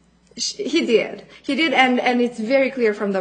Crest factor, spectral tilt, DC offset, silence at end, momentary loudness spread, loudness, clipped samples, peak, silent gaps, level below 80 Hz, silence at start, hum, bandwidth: 20 dB; -3.5 dB/octave; under 0.1%; 0 s; 10 LU; -19 LUFS; under 0.1%; 0 dBFS; none; -64 dBFS; 0.35 s; none; 9.4 kHz